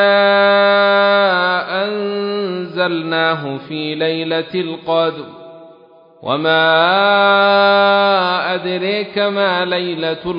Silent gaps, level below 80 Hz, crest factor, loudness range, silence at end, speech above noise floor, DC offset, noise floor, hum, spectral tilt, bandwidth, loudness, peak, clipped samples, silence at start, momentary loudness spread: none; -62 dBFS; 14 dB; 6 LU; 0 s; 30 dB; under 0.1%; -44 dBFS; none; -7.5 dB/octave; 5.4 kHz; -14 LUFS; 0 dBFS; under 0.1%; 0 s; 11 LU